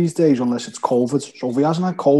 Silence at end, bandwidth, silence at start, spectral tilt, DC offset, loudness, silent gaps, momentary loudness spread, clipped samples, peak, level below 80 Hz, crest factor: 0 s; 12 kHz; 0 s; -7 dB/octave; under 0.1%; -19 LUFS; none; 6 LU; under 0.1%; -2 dBFS; -64 dBFS; 16 dB